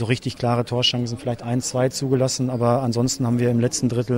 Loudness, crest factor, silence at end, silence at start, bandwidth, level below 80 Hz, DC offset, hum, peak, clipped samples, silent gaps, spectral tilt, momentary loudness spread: -21 LUFS; 14 dB; 0 s; 0 s; 16 kHz; -52 dBFS; under 0.1%; none; -6 dBFS; under 0.1%; none; -5 dB/octave; 5 LU